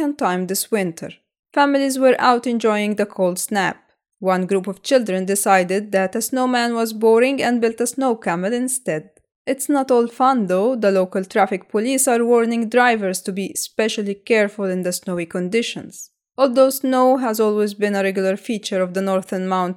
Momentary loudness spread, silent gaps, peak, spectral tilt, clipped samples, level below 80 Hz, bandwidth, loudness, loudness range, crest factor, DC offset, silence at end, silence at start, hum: 9 LU; 1.39-1.43 s, 9.36-9.45 s; -2 dBFS; -4 dB/octave; under 0.1%; -72 dBFS; 18.5 kHz; -19 LUFS; 2 LU; 18 dB; under 0.1%; 0 s; 0 s; none